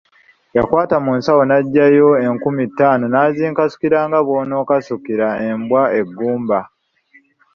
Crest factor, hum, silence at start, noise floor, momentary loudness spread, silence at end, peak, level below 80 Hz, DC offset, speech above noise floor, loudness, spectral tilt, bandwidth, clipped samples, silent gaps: 14 dB; none; 0.55 s; -53 dBFS; 8 LU; 0.9 s; 0 dBFS; -54 dBFS; under 0.1%; 38 dB; -15 LUFS; -8.5 dB/octave; 6.8 kHz; under 0.1%; none